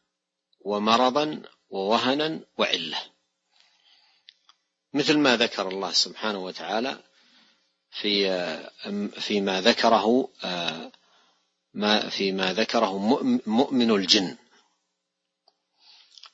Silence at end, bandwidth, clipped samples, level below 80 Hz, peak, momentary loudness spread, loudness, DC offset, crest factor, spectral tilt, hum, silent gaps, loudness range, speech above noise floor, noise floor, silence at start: 0.05 s; 8 kHz; under 0.1%; -74 dBFS; -2 dBFS; 14 LU; -24 LUFS; under 0.1%; 24 dB; -3.5 dB/octave; none; none; 5 LU; 57 dB; -82 dBFS; 0.65 s